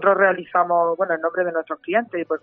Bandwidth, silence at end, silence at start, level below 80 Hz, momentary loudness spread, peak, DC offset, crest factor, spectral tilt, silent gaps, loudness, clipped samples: 3.7 kHz; 0.05 s; 0 s; -72 dBFS; 6 LU; -4 dBFS; under 0.1%; 18 dB; -3.5 dB/octave; none; -21 LUFS; under 0.1%